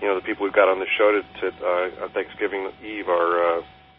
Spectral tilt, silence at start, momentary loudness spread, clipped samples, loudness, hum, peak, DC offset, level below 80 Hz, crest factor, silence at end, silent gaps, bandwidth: -8.5 dB/octave; 0 s; 10 LU; under 0.1%; -23 LUFS; none; -4 dBFS; under 0.1%; -60 dBFS; 20 dB; 0.3 s; none; 4.5 kHz